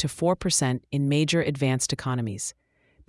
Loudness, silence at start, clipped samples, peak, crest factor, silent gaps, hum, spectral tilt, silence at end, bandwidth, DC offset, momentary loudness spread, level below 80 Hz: -25 LUFS; 0 s; under 0.1%; -8 dBFS; 18 dB; none; none; -4.5 dB/octave; 0.55 s; 12 kHz; under 0.1%; 8 LU; -54 dBFS